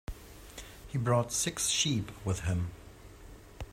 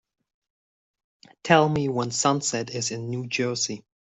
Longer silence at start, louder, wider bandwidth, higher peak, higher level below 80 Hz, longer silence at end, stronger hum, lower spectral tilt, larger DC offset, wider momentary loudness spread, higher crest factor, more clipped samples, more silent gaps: second, 0.1 s vs 1.45 s; second, -31 LUFS vs -24 LUFS; first, 16 kHz vs 8.4 kHz; second, -14 dBFS vs -4 dBFS; first, -50 dBFS vs -62 dBFS; second, 0 s vs 0.3 s; neither; about the same, -3.5 dB/octave vs -4 dB/octave; neither; first, 24 LU vs 10 LU; about the same, 20 dB vs 22 dB; neither; neither